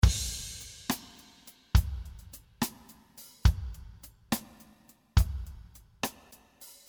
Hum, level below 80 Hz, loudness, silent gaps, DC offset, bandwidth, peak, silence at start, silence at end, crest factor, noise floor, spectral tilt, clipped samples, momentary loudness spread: none; -34 dBFS; -33 LUFS; none; under 0.1%; over 20 kHz; -8 dBFS; 0.05 s; 0.2 s; 24 dB; -60 dBFS; -4.5 dB/octave; under 0.1%; 23 LU